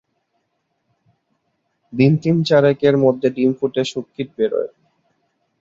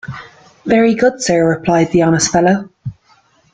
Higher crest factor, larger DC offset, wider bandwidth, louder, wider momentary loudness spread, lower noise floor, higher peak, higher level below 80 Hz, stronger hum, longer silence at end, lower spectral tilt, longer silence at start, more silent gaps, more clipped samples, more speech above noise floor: about the same, 18 dB vs 14 dB; neither; second, 7.8 kHz vs 9.4 kHz; second, -17 LUFS vs -13 LUFS; second, 13 LU vs 18 LU; first, -71 dBFS vs -53 dBFS; about the same, -2 dBFS vs 0 dBFS; second, -60 dBFS vs -46 dBFS; neither; first, 0.95 s vs 0.6 s; first, -7.5 dB/octave vs -5 dB/octave; first, 1.9 s vs 0.05 s; neither; neither; first, 54 dB vs 41 dB